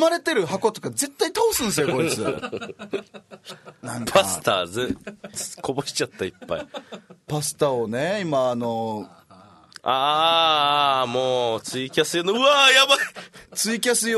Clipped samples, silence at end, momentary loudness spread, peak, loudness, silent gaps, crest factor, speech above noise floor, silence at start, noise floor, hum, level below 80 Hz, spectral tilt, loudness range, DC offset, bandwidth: under 0.1%; 0 s; 16 LU; -2 dBFS; -21 LUFS; none; 20 dB; 28 dB; 0 s; -50 dBFS; none; -58 dBFS; -2.5 dB/octave; 8 LU; under 0.1%; 12.5 kHz